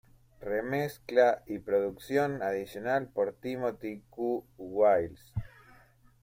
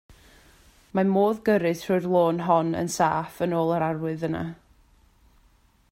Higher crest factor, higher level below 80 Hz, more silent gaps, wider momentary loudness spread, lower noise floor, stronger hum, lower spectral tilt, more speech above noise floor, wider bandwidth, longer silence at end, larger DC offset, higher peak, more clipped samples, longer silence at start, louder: about the same, 20 dB vs 18 dB; about the same, -58 dBFS vs -58 dBFS; neither; first, 15 LU vs 8 LU; about the same, -60 dBFS vs -61 dBFS; neither; about the same, -6.5 dB/octave vs -6.5 dB/octave; second, 30 dB vs 37 dB; about the same, 16.5 kHz vs 16 kHz; second, 0.75 s vs 1.4 s; neither; second, -12 dBFS vs -8 dBFS; neither; second, 0.4 s vs 0.95 s; second, -31 LUFS vs -24 LUFS